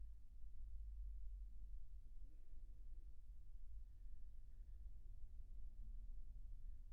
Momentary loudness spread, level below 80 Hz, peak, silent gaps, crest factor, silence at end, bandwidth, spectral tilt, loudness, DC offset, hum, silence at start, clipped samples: 7 LU; -54 dBFS; -40 dBFS; none; 10 dB; 0 s; 0.8 kHz; -11 dB/octave; -62 LUFS; under 0.1%; none; 0 s; under 0.1%